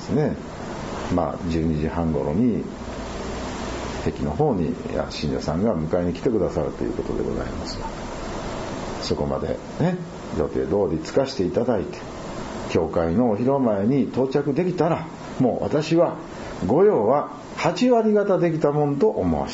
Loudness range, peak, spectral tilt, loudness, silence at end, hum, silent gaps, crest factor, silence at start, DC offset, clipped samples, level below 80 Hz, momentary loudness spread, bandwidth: 6 LU; -6 dBFS; -7 dB/octave; -23 LUFS; 0 s; none; none; 18 dB; 0 s; under 0.1%; under 0.1%; -40 dBFS; 12 LU; 8 kHz